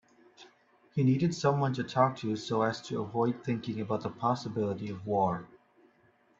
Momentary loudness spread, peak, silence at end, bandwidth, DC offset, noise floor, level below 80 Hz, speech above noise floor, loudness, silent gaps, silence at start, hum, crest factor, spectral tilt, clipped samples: 7 LU; -10 dBFS; 0.95 s; 8 kHz; under 0.1%; -66 dBFS; -70 dBFS; 36 dB; -31 LUFS; none; 0.4 s; none; 20 dB; -7 dB/octave; under 0.1%